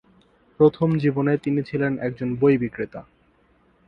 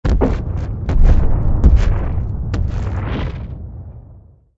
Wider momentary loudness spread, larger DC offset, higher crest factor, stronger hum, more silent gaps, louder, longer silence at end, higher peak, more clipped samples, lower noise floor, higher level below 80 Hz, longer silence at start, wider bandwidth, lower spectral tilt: second, 11 LU vs 17 LU; neither; first, 20 dB vs 14 dB; neither; neither; second, -22 LUFS vs -19 LUFS; first, 0.85 s vs 0.4 s; second, -4 dBFS vs 0 dBFS; neither; first, -60 dBFS vs -43 dBFS; second, -56 dBFS vs -16 dBFS; first, 0.6 s vs 0.05 s; second, 5.6 kHz vs 7.2 kHz; first, -10 dB/octave vs -8.5 dB/octave